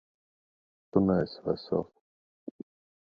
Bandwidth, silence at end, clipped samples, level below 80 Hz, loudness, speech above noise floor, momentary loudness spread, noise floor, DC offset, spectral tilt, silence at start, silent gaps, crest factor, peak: 5.2 kHz; 0.55 s; under 0.1%; -58 dBFS; -30 LUFS; over 62 dB; 23 LU; under -90 dBFS; under 0.1%; -10 dB/octave; 0.95 s; 2.01-2.47 s; 24 dB; -10 dBFS